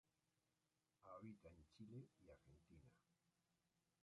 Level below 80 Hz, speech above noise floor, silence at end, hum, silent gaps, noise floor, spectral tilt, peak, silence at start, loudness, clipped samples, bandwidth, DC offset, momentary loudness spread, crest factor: -82 dBFS; over 25 dB; 0.25 s; none; none; under -90 dBFS; -7.5 dB/octave; -48 dBFS; 1 s; -63 LUFS; under 0.1%; 10 kHz; under 0.1%; 7 LU; 18 dB